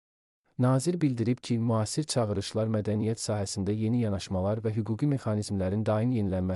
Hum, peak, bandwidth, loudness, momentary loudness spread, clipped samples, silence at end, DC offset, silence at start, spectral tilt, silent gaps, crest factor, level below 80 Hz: none; -14 dBFS; 12 kHz; -29 LUFS; 4 LU; under 0.1%; 0 s; under 0.1%; 0.6 s; -6.5 dB/octave; none; 14 dB; -60 dBFS